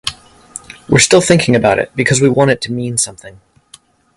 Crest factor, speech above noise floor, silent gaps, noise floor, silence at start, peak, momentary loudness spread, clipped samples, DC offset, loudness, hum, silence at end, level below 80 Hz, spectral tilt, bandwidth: 14 dB; 33 dB; none; -46 dBFS; 0.05 s; 0 dBFS; 22 LU; under 0.1%; under 0.1%; -12 LUFS; none; 0.85 s; -44 dBFS; -4 dB/octave; 12 kHz